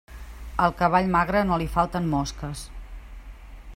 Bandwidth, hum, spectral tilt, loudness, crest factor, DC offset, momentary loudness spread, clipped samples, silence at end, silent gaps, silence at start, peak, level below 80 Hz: 16 kHz; none; -6 dB/octave; -24 LUFS; 20 dB; under 0.1%; 23 LU; under 0.1%; 0 s; none; 0.1 s; -6 dBFS; -38 dBFS